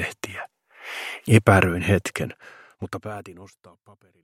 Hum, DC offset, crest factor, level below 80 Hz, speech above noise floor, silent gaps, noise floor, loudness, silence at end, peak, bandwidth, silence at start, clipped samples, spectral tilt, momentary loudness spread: none; under 0.1%; 24 dB; -52 dBFS; 19 dB; none; -42 dBFS; -22 LUFS; 0.75 s; 0 dBFS; 15.5 kHz; 0 s; under 0.1%; -6 dB/octave; 25 LU